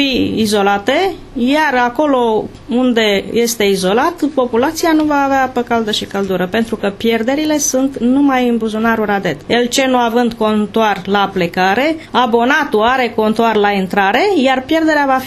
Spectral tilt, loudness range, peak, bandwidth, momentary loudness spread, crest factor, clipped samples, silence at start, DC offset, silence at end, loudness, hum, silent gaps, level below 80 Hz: -4 dB/octave; 2 LU; 0 dBFS; 14 kHz; 4 LU; 14 dB; under 0.1%; 0 s; under 0.1%; 0 s; -14 LUFS; none; none; -44 dBFS